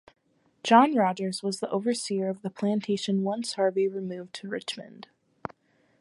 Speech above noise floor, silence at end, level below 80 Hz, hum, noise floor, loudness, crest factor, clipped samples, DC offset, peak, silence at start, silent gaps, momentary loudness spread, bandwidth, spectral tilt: 33 dB; 0.95 s; -76 dBFS; none; -60 dBFS; -27 LUFS; 24 dB; under 0.1%; under 0.1%; -4 dBFS; 0.65 s; none; 19 LU; 11.5 kHz; -5 dB/octave